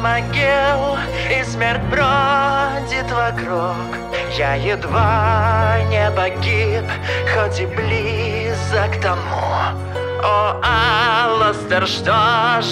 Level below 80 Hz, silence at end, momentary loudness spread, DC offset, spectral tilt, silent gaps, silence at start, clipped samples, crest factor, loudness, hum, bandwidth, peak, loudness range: -36 dBFS; 0 s; 7 LU; under 0.1%; -5.5 dB/octave; none; 0 s; under 0.1%; 14 dB; -17 LUFS; none; 12 kHz; -4 dBFS; 3 LU